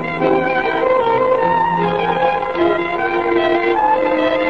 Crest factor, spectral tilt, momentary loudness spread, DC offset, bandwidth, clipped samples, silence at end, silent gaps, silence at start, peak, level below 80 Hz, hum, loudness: 12 dB; -7 dB/octave; 2 LU; 0.6%; 7 kHz; under 0.1%; 0 s; none; 0 s; -2 dBFS; -48 dBFS; none; -16 LUFS